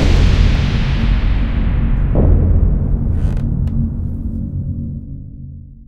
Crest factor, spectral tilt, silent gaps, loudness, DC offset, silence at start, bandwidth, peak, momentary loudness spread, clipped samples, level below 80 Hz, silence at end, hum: 14 dB; -7.5 dB/octave; none; -17 LUFS; under 0.1%; 0 s; 7.4 kHz; 0 dBFS; 14 LU; under 0.1%; -16 dBFS; 0.05 s; none